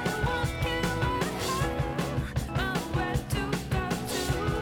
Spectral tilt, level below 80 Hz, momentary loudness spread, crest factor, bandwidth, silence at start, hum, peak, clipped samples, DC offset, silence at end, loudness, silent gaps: -5 dB/octave; -38 dBFS; 2 LU; 14 dB; 19 kHz; 0 s; none; -14 dBFS; under 0.1%; under 0.1%; 0 s; -30 LUFS; none